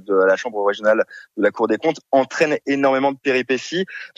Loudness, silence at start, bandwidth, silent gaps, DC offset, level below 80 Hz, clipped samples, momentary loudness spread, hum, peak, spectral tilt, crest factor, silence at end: -19 LUFS; 0.1 s; 8.2 kHz; none; under 0.1%; -70 dBFS; under 0.1%; 5 LU; none; -4 dBFS; -4.5 dB/octave; 16 dB; 0.1 s